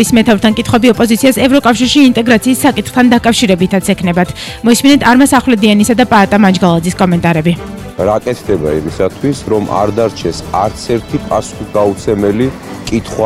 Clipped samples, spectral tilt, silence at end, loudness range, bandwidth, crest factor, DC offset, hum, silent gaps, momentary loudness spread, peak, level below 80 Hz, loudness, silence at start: 0.2%; -5 dB/octave; 0 s; 6 LU; 15.5 kHz; 10 dB; under 0.1%; none; none; 9 LU; 0 dBFS; -34 dBFS; -10 LUFS; 0 s